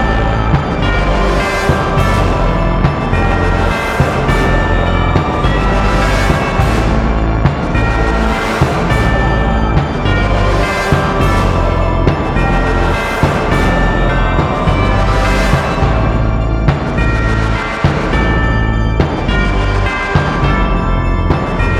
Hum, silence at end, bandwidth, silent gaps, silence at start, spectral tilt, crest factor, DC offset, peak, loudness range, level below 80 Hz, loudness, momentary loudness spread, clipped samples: none; 0 s; 13 kHz; none; 0 s; -6.5 dB/octave; 12 dB; under 0.1%; 0 dBFS; 1 LU; -16 dBFS; -13 LUFS; 2 LU; under 0.1%